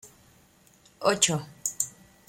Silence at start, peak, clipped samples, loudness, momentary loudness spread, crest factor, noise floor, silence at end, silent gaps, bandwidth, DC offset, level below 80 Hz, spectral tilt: 0.05 s; -6 dBFS; under 0.1%; -27 LUFS; 9 LU; 24 dB; -59 dBFS; 0.4 s; none; 16.5 kHz; under 0.1%; -66 dBFS; -2 dB/octave